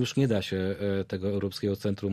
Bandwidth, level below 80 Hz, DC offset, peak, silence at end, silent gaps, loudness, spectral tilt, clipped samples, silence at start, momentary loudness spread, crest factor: 15 kHz; -60 dBFS; under 0.1%; -12 dBFS; 0 s; none; -29 LUFS; -6.5 dB/octave; under 0.1%; 0 s; 4 LU; 16 dB